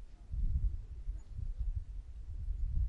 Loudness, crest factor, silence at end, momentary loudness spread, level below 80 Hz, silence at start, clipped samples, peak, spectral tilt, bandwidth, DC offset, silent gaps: -43 LUFS; 14 dB; 0 s; 10 LU; -38 dBFS; 0 s; under 0.1%; -22 dBFS; -8.5 dB/octave; 2.1 kHz; under 0.1%; none